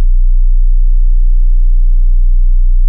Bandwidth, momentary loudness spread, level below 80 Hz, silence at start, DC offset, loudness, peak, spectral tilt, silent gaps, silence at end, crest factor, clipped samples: 0.2 kHz; 0 LU; -6 dBFS; 0 s; under 0.1%; -15 LUFS; -2 dBFS; -16 dB/octave; none; 0 s; 4 dB; under 0.1%